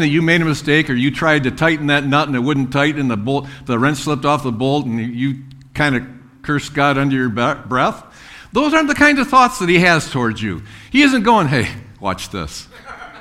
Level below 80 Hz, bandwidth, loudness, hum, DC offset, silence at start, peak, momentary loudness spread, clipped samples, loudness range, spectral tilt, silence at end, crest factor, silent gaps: -44 dBFS; 15 kHz; -16 LUFS; none; under 0.1%; 0 s; 0 dBFS; 14 LU; under 0.1%; 5 LU; -5.5 dB/octave; 0 s; 16 dB; none